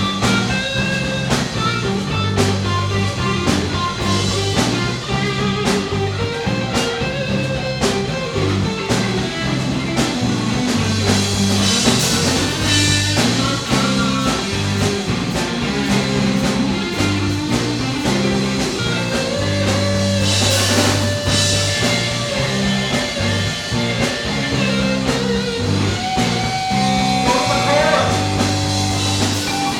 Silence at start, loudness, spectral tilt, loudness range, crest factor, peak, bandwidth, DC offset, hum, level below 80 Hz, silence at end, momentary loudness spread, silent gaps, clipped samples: 0 s; -17 LUFS; -4 dB/octave; 4 LU; 16 dB; 0 dBFS; 17.5 kHz; under 0.1%; none; -36 dBFS; 0 s; 5 LU; none; under 0.1%